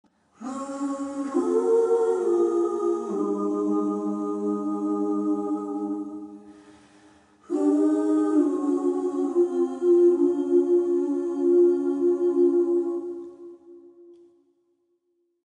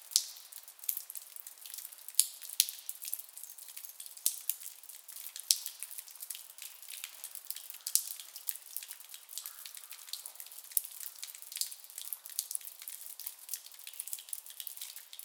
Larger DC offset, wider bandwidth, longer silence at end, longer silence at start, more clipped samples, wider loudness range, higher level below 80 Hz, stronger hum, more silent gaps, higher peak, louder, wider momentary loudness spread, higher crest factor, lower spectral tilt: neither; second, 9.8 kHz vs 19 kHz; first, 1.3 s vs 0 s; first, 0.4 s vs 0 s; neither; about the same, 7 LU vs 6 LU; first, -76 dBFS vs under -90 dBFS; neither; neither; second, -10 dBFS vs 0 dBFS; first, -24 LUFS vs -38 LUFS; second, 11 LU vs 15 LU; second, 14 dB vs 40 dB; first, -7.5 dB/octave vs 6 dB/octave